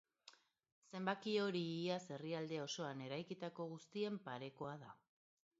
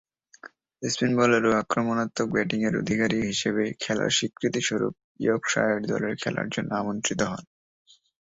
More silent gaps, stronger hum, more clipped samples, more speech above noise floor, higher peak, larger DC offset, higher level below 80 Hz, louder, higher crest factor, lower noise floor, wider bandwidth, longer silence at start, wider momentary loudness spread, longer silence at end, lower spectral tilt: about the same, 0.72-0.82 s vs 5.04-5.15 s; neither; neither; about the same, 24 dB vs 24 dB; second, -26 dBFS vs -6 dBFS; neither; second, -88 dBFS vs -60 dBFS; second, -45 LUFS vs -26 LUFS; about the same, 20 dB vs 20 dB; first, -69 dBFS vs -50 dBFS; about the same, 7.6 kHz vs 8 kHz; second, 0.25 s vs 0.45 s; first, 15 LU vs 7 LU; second, 0.65 s vs 0.95 s; about the same, -4.5 dB/octave vs -4 dB/octave